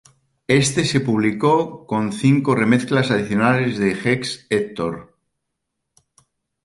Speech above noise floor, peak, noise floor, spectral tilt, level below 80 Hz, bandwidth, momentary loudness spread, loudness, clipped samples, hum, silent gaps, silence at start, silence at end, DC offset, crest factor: 59 dB; -2 dBFS; -78 dBFS; -5.5 dB/octave; -54 dBFS; 11.5 kHz; 8 LU; -19 LUFS; under 0.1%; none; none; 0.5 s; 1.6 s; under 0.1%; 18 dB